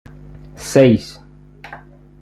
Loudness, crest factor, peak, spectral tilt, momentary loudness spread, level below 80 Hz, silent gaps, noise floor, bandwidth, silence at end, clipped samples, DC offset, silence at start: -14 LUFS; 18 dB; 0 dBFS; -6.5 dB/octave; 25 LU; -46 dBFS; none; -41 dBFS; 14 kHz; 0.45 s; under 0.1%; under 0.1%; 0.6 s